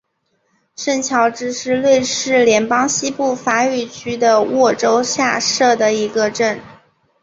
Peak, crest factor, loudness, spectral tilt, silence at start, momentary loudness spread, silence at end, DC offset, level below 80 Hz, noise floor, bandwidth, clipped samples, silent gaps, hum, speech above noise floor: 0 dBFS; 16 dB; -16 LUFS; -2.5 dB/octave; 0.8 s; 6 LU; 0.5 s; under 0.1%; -58 dBFS; -66 dBFS; 8 kHz; under 0.1%; none; none; 51 dB